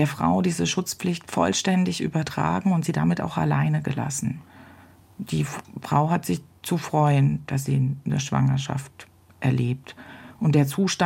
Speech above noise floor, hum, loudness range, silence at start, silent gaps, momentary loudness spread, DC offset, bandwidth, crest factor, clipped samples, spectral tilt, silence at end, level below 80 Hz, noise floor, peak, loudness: 27 dB; none; 3 LU; 0 s; none; 10 LU; under 0.1%; 16.5 kHz; 18 dB; under 0.1%; -5.5 dB/octave; 0 s; -54 dBFS; -50 dBFS; -6 dBFS; -24 LUFS